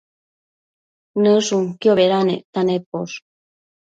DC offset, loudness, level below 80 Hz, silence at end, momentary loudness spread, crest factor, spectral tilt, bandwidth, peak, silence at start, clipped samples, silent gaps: under 0.1%; -18 LUFS; -66 dBFS; 0.7 s; 13 LU; 16 dB; -5.5 dB/octave; 9 kHz; -4 dBFS; 1.15 s; under 0.1%; 2.45-2.53 s, 2.86-2.92 s